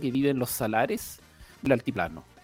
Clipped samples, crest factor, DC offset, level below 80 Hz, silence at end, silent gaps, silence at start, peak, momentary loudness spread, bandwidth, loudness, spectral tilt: under 0.1%; 22 dB; under 0.1%; -54 dBFS; 0.2 s; none; 0 s; -8 dBFS; 9 LU; 18 kHz; -28 LUFS; -5.5 dB/octave